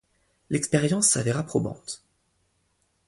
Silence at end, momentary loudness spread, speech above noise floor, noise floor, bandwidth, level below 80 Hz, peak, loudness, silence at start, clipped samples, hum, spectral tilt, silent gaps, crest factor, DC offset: 1.1 s; 17 LU; 46 dB; -71 dBFS; 11.5 kHz; -58 dBFS; -8 dBFS; -24 LUFS; 0.5 s; under 0.1%; none; -4 dB/octave; none; 20 dB; under 0.1%